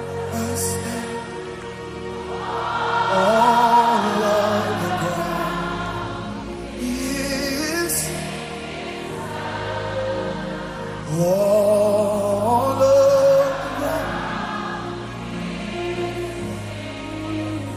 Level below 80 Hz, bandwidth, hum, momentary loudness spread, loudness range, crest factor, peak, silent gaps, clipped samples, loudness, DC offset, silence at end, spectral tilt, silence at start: -44 dBFS; 15.5 kHz; none; 15 LU; 9 LU; 18 dB; -4 dBFS; none; under 0.1%; -22 LUFS; under 0.1%; 0 s; -4.5 dB/octave; 0 s